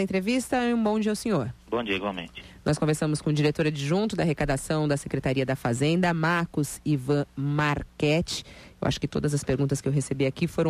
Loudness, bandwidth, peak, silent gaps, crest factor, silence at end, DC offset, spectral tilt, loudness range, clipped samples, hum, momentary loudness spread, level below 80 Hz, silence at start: -26 LUFS; 15 kHz; -12 dBFS; none; 14 dB; 0 s; under 0.1%; -6 dB/octave; 1 LU; under 0.1%; none; 5 LU; -48 dBFS; 0 s